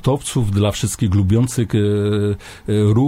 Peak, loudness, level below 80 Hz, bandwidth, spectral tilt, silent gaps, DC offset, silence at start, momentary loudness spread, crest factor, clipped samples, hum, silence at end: -4 dBFS; -18 LUFS; -38 dBFS; 15.5 kHz; -6.5 dB/octave; none; under 0.1%; 0.05 s; 5 LU; 14 dB; under 0.1%; none; 0 s